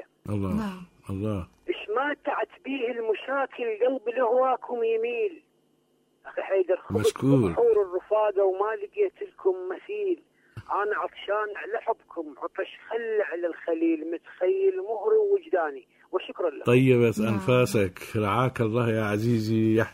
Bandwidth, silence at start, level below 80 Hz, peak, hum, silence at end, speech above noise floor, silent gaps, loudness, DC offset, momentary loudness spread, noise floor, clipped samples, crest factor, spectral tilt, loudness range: 16 kHz; 0 s; -60 dBFS; -8 dBFS; none; 0 s; 42 dB; none; -27 LUFS; under 0.1%; 11 LU; -68 dBFS; under 0.1%; 18 dB; -7 dB/octave; 6 LU